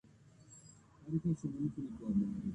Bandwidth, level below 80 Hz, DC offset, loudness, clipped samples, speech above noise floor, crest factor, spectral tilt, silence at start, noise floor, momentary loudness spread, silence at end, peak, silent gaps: 9.8 kHz; -62 dBFS; under 0.1%; -38 LUFS; under 0.1%; 25 dB; 16 dB; -9 dB/octave; 0.45 s; -62 dBFS; 21 LU; 0 s; -24 dBFS; none